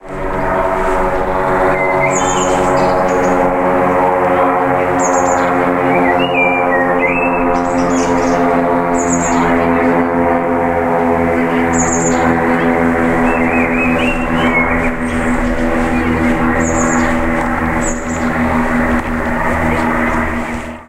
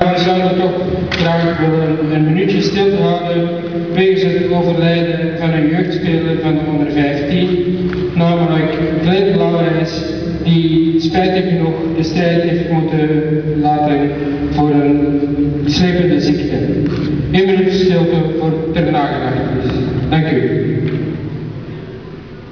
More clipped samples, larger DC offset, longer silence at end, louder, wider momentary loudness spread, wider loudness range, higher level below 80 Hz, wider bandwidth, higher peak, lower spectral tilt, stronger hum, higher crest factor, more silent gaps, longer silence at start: neither; second, under 0.1% vs 0.4%; about the same, 0.05 s vs 0 s; about the same, -13 LUFS vs -14 LUFS; about the same, 3 LU vs 5 LU; about the same, 2 LU vs 1 LU; first, -28 dBFS vs -36 dBFS; first, 15.5 kHz vs 5.4 kHz; about the same, 0 dBFS vs 0 dBFS; second, -5 dB/octave vs -8 dB/octave; neither; about the same, 12 dB vs 14 dB; neither; about the same, 0.05 s vs 0 s